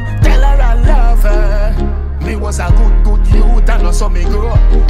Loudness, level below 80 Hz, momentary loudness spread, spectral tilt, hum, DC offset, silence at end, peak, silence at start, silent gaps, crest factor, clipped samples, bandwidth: -13 LUFS; -8 dBFS; 6 LU; -6.5 dB/octave; none; under 0.1%; 0 s; 0 dBFS; 0 s; none; 8 dB; under 0.1%; 10 kHz